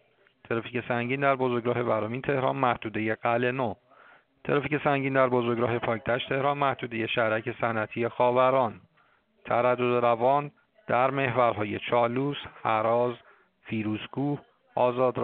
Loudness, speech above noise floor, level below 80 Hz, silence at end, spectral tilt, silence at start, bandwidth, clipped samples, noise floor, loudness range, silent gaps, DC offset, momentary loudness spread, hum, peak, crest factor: -27 LUFS; 39 dB; -66 dBFS; 0 s; -4.5 dB/octave; 0.5 s; 4.5 kHz; under 0.1%; -66 dBFS; 2 LU; none; under 0.1%; 8 LU; none; -8 dBFS; 20 dB